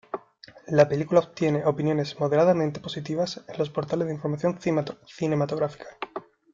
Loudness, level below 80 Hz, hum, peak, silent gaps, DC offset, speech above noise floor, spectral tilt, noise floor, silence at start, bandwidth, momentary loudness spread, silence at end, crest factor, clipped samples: -25 LUFS; -64 dBFS; none; -4 dBFS; none; under 0.1%; 26 dB; -7 dB/octave; -51 dBFS; 0.15 s; 7.6 kHz; 16 LU; 0.35 s; 22 dB; under 0.1%